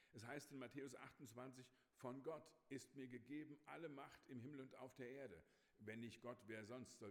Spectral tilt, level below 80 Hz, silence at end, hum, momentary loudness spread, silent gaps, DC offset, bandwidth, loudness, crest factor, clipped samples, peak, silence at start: -5.5 dB/octave; under -90 dBFS; 0 s; none; 5 LU; none; under 0.1%; 17 kHz; -58 LUFS; 18 dB; under 0.1%; -40 dBFS; 0 s